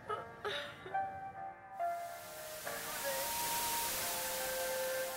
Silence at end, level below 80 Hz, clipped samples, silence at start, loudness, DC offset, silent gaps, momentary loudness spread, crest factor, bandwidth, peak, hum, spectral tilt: 0 s; -68 dBFS; under 0.1%; 0 s; -39 LUFS; under 0.1%; none; 11 LU; 16 dB; 16 kHz; -24 dBFS; none; -1 dB/octave